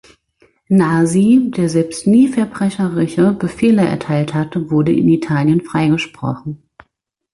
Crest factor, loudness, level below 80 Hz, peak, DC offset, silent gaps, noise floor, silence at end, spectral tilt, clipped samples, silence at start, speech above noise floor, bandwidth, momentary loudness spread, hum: 12 dB; -15 LUFS; -50 dBFS; -2 dBFS; under 0.1%; none; -69 dBFS; 0.8 s; -7 dB/octave; under 0.1%; 0.7 s; 55 dB; 11.5 kHz; 8 LU; none